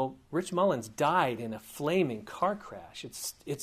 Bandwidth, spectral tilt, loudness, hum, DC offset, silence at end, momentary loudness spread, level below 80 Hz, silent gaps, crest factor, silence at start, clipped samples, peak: 15.5 kHz; -5 dB/octave; -31 LUFS; none; under 0.1%; 0 s; 13 LU; -66 dBFS; none; 18 dB; 0 s; under 0.1%; -14 dBFS